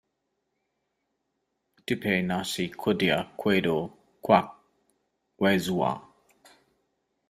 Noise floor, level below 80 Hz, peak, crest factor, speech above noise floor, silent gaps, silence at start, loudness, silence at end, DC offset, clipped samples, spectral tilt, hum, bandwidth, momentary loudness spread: -79 dBFS; -64 dBFS; -6 dBFS; 24 dB; 53 dB; none; 1.9 s; -26 LUFS; 1.3 s; under 0.1%; under 0.1%; -5.5 dB/octave; none; 15.5 kHz; 15 LU